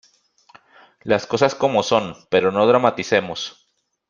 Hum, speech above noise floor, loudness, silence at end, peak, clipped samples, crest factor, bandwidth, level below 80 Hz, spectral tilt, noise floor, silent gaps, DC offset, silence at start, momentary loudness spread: none; 38 dB; -19 LUFS; 0.6 s; -2 dBFS; under 0.1%; 20 dB; 7.4 kHz; -60 dBFS; -4.5 dB/octave; -57 dBFS; none; under 0.1%; 1.05 s; 13 LU